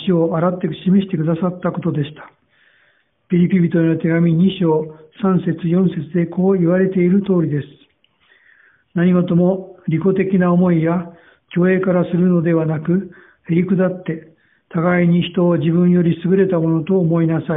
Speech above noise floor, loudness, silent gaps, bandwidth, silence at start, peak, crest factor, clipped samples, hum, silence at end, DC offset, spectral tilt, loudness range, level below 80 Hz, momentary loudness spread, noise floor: 44 dB; -17 LUFS; none; 3.9 kHz; 0 s; -2 dBFS; 14 dB; under 0.1%; none; 0 s; under 0.1%; -8 dB/octave; 2 LU; -54 dBFS; 8 LU; -59 dBFS